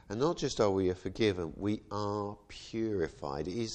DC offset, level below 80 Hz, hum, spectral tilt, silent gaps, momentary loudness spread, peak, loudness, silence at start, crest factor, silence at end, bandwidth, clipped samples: under 0.1%; -56 dBFS; none; -5.5 dB/octave; none; 9 LU; -14 dBFS; -34 LUFS; 0.1 s; 18 dB; 0 s; 9.2 kHz; under 0.1%